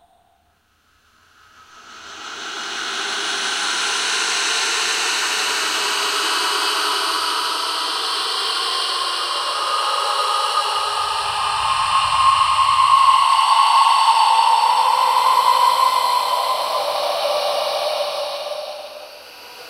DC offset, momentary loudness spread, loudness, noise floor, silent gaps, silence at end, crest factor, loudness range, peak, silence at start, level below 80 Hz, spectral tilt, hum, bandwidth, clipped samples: under 0.1%; 12 LU; -17 LUFS; -61 dBFS; none; 0 s; 16 dB; 8 LU; -2 dBFS; 1.75 s; -56 dBFS; 1 dB/octave; none; 16 kHz; under 0.1%